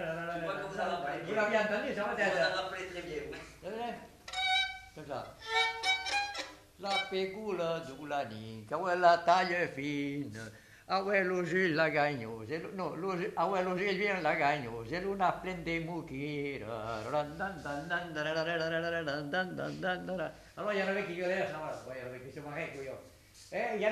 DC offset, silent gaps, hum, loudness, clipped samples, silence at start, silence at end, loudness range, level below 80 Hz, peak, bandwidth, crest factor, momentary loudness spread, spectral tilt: under 0.1%; none; none; -34 LUFS; under 0.1%; 0 s; 0 s; 5 LU; -64 dBFS; -12 dBFS; 14 kHz; 22 dB; 13 LU; -4.5 dB/octave